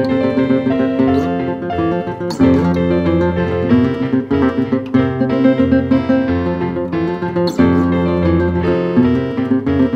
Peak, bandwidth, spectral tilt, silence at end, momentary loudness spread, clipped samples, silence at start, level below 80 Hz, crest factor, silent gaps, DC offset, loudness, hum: 0 dBFS; 7.8 kHz; -8.5 dB/octave; 0 s; 6 LU; under 0.1%; 0 s; -36 dBFS; 14 dB; none; under 0.1%; -15 LUFS; none